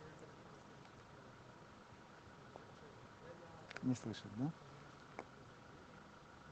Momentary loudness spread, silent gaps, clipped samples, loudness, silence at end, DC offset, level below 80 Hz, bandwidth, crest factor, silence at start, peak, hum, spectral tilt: 15 LU; none; under 0.1%; -52 LUFS; 0 s; under 0.1%; -74 dBFS; 8.4 kHz; 22 dB; 0 s; -28 dBFS; none; -6 dB/octave